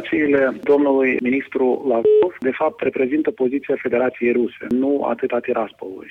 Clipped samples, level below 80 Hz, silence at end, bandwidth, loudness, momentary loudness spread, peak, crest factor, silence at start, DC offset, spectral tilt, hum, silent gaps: under 0.1%; -60 dBFS; 0 s; 4.1 kHz; -19 LUFS; 6 LU; -4 dBFS; 14 dB; 0 s; under 0.1%; -8 dB/octave; none; none